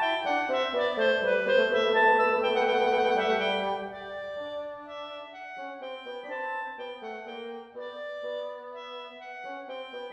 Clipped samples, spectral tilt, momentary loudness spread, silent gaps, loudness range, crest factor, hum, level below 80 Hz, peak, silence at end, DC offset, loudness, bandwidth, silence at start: under 0.1%; -4 dB/octave; 17 LU; none; 14 LU; 18 dB; none; -68 dBFS; -10 dBFS; 0 s; under 0.1%; -27 LUFS; 8.4 kHz; 0 s